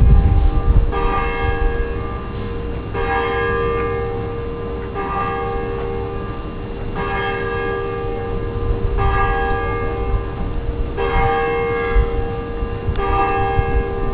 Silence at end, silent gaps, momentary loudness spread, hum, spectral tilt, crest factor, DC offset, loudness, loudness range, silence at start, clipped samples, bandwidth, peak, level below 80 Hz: 0 s; none; 8 LU; none; -5.5 dB/octave; 18 dB; 0.4%; -21 LUFS; 4 LU; 0 s; under 0.1%; 4.6 kHz; 0 dBFS; -22 dBFS